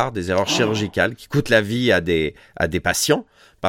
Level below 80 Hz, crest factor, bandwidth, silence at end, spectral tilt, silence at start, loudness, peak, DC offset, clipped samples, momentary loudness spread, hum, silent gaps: -44 dBFS; 18 dB; 17 kHz; 0 s; -4 dB/octave; 0 s; -20 LUFS; -2 dBFS; under 0.1%; under 0.1%; 6 LU; none; none